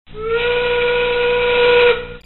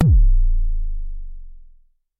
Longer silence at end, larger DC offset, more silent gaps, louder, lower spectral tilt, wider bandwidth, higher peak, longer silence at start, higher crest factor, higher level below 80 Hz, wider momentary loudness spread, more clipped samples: second, 0.1 s vs 0.55 s; neither; neither; first, -15 LUFS vs -22 LUFS; second, 0 dB/octave vs -10.5 dB/octave; first, 4.3 kHz vs 0.9 kHz; about the same, -4 dBFS vs -2 dBFS; about the same, 0.1 s vs 0 s; about the same, 12 dB vs 14 dB; second, -36 dBFS vs -18 dBFS; second, 6 LU vs 22 LU; neither